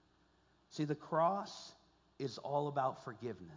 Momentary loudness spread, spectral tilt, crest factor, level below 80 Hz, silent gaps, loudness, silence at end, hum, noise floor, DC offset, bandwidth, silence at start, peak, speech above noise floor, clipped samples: 16 LU; -6.5 dB/octave; 20 dB; -78 dBFS; none; -39 LUFS; 0 s; none; -72 dBFS; under 0.1%; 7.6 kHz; 0.7 s; -22 dBFS; 34 dB; under 0.1%